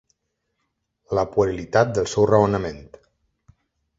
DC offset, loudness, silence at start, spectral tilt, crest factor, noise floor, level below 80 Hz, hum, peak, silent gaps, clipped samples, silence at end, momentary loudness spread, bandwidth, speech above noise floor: under 0.1%; -21 LUFS; 1.1 s; -6 dB/octave; 22 dB; -76 dBFS; -48 dBFS; none; -2 dBFS; none; under 0.1%; 1.15 s; 10 LU; 8 kHz; 56 dB